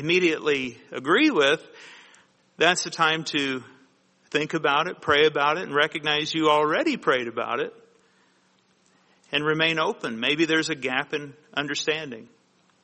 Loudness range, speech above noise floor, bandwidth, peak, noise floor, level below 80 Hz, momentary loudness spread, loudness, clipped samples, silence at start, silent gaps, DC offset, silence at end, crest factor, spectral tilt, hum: 4 LU; 40 dB; 8.8 kHz; -4 dBFS; -64 dBFS; -68 dBFS; 10 LU; -23 LUFS; under 0.1%; 0 s; none; under 0.1%; 0.6 s; 22 dB; -3.5 dB/octave; none